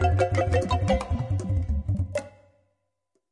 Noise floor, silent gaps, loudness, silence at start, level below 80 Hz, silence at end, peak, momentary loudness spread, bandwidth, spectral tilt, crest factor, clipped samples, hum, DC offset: -77 dBFS; none; -26 LUFS; 0 s; -36 dBFS; 1 s; -10 dBFS; 6 LU; 11 kHz; -7 dB/octave; 16 dB; under 0.1%; none; under 0.1%